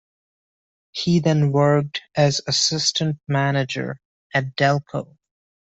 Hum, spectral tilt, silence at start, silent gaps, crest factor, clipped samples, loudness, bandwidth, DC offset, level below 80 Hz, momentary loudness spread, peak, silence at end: none; -4.5 dB/octave; 0.95 s; 4.05-4.30 s; 18 dB; under 0.1%; -20 LUFS; 8.2 kHz; under 0.1%; -58 dBFS; 14 LU; -4 dBFS; 0.75 s